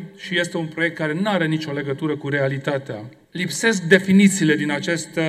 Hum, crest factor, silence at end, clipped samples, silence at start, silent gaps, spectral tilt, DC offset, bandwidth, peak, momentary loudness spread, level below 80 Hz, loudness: none; 20 dB; 0 s; under 0.1%; 0 s; none; -5 dB/octave; under 0.1%; 14 kHz; 0 dBFS; 11 LU; -66 dBFS; -20 LUFS